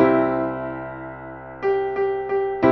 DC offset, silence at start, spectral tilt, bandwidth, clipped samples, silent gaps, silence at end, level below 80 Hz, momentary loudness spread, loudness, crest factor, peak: under 0.1%; 0 s; -9 dB/octave; 5.8 kHz; under 0.1%; none; 0 s; -52 dBFS; 15 LU; -23 LUFS; 18 dB; -4 dBFS